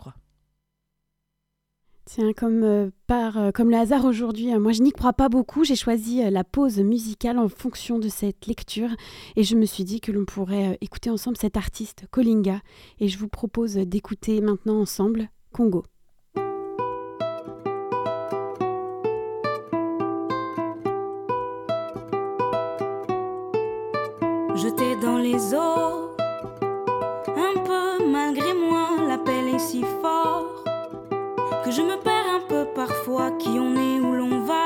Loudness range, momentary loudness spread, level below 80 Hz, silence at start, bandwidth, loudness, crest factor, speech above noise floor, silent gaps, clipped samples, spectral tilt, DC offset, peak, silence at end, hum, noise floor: 6 LU; 9 LU; -46 dBFS; 0 s; 17.5 kHz; -24 LUFS; 18 dB; 56 dB; none; under 0.1%; -5.5 dB/octave; under 0.1%; -6 dBFS; 0 s; none; -78 dBFS